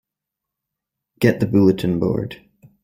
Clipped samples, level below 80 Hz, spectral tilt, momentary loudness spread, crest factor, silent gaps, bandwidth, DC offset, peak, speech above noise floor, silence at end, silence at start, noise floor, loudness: under 0.1%; -50 dBFS; -8 dB/octave; 9 LU; 18 dB; none; 16 kHz; under 0.1%; -2 dBFS; 67 dB; 0.5 s; 1.2 s; -84 dBFS; -18 LUFS